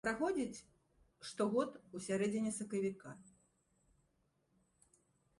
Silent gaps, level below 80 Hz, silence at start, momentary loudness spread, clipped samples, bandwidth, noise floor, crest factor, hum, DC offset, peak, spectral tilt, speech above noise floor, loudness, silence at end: none; -74 dBFS; 0.05 s; 17 LU; under 0.1%; 11.5 kHz; -79 dBFS; 20 dB; none; under 0.1%; -22 dBFS; -5 dB/octave; 40 dB; -39 LUFS; 2.1 s